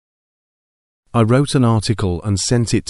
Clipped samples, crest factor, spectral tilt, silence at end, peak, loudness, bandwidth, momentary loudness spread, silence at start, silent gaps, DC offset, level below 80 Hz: under 0.1%; 16 dB; -6 dB/octave; 0.1 s; -2 dBFS; -17 LUFS; 11.5 kHz; 5 LU; 1.15 s; none; under 0.1%; -38 dBFS